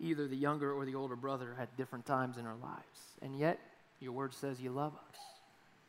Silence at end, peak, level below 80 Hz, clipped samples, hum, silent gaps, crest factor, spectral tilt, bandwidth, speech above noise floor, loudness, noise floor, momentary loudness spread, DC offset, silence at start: 0.45 s; -20 dBFS; -84 dBFS; under 0.1%; none; none; 22 dB; -7 dB/octave; 16 kHz; 26 dB; -40 LUFS; -66 dBFS; 15 LU; under 0.1%; 0 s